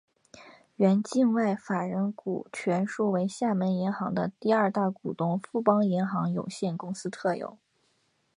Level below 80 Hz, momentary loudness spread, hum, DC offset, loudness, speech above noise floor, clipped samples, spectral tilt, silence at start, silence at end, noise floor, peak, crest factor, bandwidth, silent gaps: -72 dBFS; 8 LU; none; under 0.1%; -28 LUFS; 44 dB; under 0.1%; -7 dB/octave; 0.35 s; 0.85 s; -71 dBFS; -8 dBFS; 20 dB; 11 kHz; none